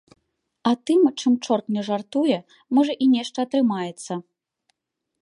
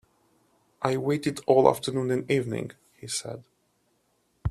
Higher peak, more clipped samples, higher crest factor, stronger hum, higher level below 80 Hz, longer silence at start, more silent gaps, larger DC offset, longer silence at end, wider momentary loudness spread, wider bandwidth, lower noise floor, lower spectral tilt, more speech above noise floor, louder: about the same, -6 dBFS vs -4 dBFS; neither; second, 16 dB vs 24 dB; neither; second, -76 dBFS vs -62 dBFS; second, 0.65 s vs 0.8 s; neither; neither; first, 1 s vs 0 s; second, 10 LU vs 20 LU; second, 11 kHz vs 14 kHz; first, -82 dBFS vs -70 dBFS; about the same, -5.5 dB/octave vs -5.5 dB/octave; first, 60 dB vs 45 dB; first, -22 LUFS vs -26 LUFS